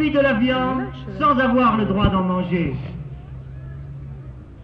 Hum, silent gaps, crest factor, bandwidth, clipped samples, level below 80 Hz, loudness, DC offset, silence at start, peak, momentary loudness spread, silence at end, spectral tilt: none; none; 16 dB; 5.8 kHz; under 0.1%; -36 dBFS; -19 LUFS; under 0.1%; 0 s; -4 dBFS; 19 LU; 0 s; -9 dB/octave